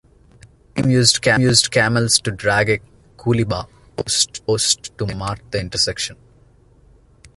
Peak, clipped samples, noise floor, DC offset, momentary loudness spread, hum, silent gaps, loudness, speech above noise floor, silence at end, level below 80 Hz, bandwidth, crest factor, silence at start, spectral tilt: 0 dBFS; under 0.1%; -51 dBFS; under 0.1%; 13 LU; none; none; -17 LUFS; 33 dB; 0.1 s; -44 dBFS; 12 kHz; 20 dB; 0.75 s; -3.5 dB/octave